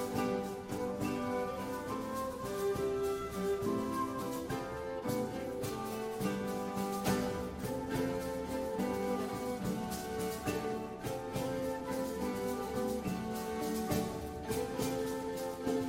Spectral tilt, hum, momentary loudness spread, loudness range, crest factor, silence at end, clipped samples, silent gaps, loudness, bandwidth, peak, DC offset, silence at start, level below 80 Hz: -5.5 dB/octave; none; 4 LU; 1 LU; 18 dB; 0 s; under 0.1%; none; -37 LUFS; 16.5 kHz; -18 dBFS; under 0.1%; 0 s; -56 dBFS